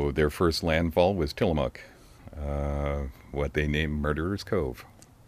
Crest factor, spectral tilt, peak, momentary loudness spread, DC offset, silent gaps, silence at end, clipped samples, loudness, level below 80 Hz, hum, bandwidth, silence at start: 20 dB; -6.5 dB/octave; -8 dBFS; 11 LU; under 0.1%; none; 0.4 s; under 0.1%; -28 LUFS; -38 dBFS; none; 15.5 kHz; 0 s